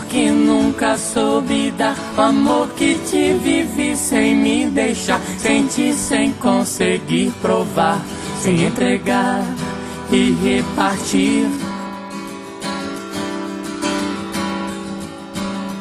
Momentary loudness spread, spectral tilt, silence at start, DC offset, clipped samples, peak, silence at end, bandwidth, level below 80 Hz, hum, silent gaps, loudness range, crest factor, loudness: 11 LU; -4.5 dB/octave; 0 s; under 0.1%; under 0.1%; -2 dBFS; 0 s; 13 kHz; -46 dBFS; none; none; 8 LU; 16 dB; -18 LUFS